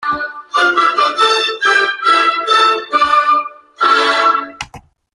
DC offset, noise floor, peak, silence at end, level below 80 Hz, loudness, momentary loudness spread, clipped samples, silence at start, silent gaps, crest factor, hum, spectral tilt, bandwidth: under 0.1%; -39 dBFS; 0 dBFS; 0.35 s; -54 dBFS; -12 LUFS; 9 LU; under 0.1%; 0 s; none; 14 dB; none; -1 dB/octave; 11 kHz